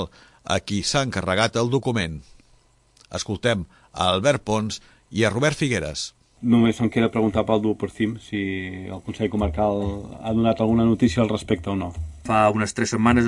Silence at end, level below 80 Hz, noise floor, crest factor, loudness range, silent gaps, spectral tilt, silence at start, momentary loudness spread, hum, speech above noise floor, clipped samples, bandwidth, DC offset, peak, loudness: 0 s; -44 dBFS; -58 dBFS; 20 dB; 3 LU; none; -5.5 dB/octave; 0 s; 12 LU; none; 36 dB; under 0.1%; 11.5 kHz; under 0.1%; -2 dBFS; -23 LUFS